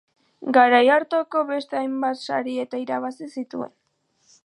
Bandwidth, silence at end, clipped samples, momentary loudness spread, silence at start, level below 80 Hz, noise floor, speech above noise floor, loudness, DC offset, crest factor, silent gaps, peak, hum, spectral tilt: 11 kHz; 0.8 s; under 0.1%; 17 LU; 0.4 s; -80 dBFS; -68 dBFS; 47 dB; -22 LUFS; under 0.1%; 20 dB; none; -2 dBFS; none; -4.5 dB/octave